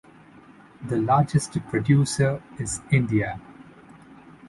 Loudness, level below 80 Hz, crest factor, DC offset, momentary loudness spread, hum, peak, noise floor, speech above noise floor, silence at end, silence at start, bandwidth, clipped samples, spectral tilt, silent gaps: -23 LUFS; -52 dBFS; 18 dB; under 0.1%; 11 LU; none; -8 dBFS; -50 dBFS; 27 dB; 0 s; 0.8 s; 11.5 kHz; under 0.1%; -6 dB/octave; none